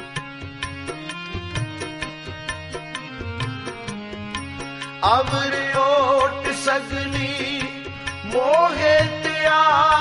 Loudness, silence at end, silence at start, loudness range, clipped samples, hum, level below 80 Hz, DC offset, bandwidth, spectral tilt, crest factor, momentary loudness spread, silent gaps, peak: -22 LUFS; 0 s; 0 s; 10 LU; under 0.1%; none; -44 dBFS; under 0.1%; 11.5 kHz; -4.5 dB/octave; 18 dB; 15 LU; none; -4 dBFS